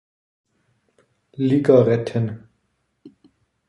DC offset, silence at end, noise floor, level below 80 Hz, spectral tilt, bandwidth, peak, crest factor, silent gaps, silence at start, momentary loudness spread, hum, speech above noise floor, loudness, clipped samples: under 0.1%; 0.6 s; -70 dBFS; -60 dBFS; -9 dB/octave; 11 kHz; -2 dBFS; 20 dB; none; 1.4 s; 21 LU; none; 53 dB; -19 LUFS; under 0.1%